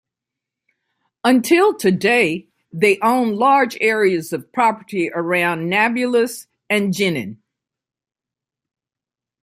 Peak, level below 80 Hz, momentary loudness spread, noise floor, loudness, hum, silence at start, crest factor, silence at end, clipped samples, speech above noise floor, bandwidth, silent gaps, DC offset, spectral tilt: -2 dBFS; -66 dBFS; 9 LU; -88 dBFS; -17 LUFS; none; 1.25 s; 18 dB; 2.1 s; under 0.1%; 72 dB; 16 kHz; none; under 0.1%; -5 dB/octave